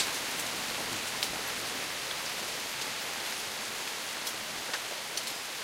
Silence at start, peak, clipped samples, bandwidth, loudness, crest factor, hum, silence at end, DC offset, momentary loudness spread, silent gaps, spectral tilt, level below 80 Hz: 0 s; -10 dBFS; under 0.1%; 16 kHz; -33 LUFS; 26 dB; none; 0 s; under 0.1%; 2 LU; none; 0 dB/octave; -66 dBFS